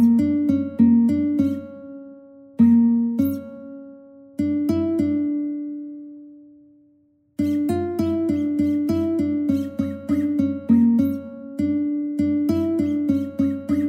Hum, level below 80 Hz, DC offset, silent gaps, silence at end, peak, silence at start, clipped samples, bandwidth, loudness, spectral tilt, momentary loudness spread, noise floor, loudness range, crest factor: none; -54 dBFS; under 0.1%; none; 0 s; -6 dBFS; 0 s; under 0.1%; 15.5 kHz; -21 LUFS; -9 dB/octave; 19 LU; -60 dBFS; 6 LU; 16 dB